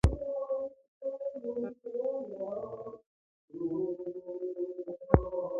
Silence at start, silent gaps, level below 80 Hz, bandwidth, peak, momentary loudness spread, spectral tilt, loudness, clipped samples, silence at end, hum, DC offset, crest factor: 0.05 s; 0.88-1.01 s, 3.06-3.48 s; -42 dBFS; 7.4 kHz; -4 dBFS; 14 LU; -9 dB/octave; -35 LUFS; under 0.1%; 0 s; none; under 0.1%; 30 dB